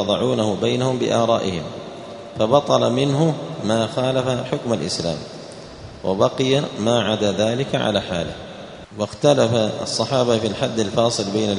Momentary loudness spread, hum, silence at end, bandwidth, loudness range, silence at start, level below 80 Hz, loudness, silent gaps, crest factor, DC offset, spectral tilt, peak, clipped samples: 16 LU; none; 0 s; 11 kHz; 2 LU; 0 s; -52 dBFS; -20 LUFS; none; 20 dB; under 0.1%; -5 dB/octave; 0 dBFS; under 0.1%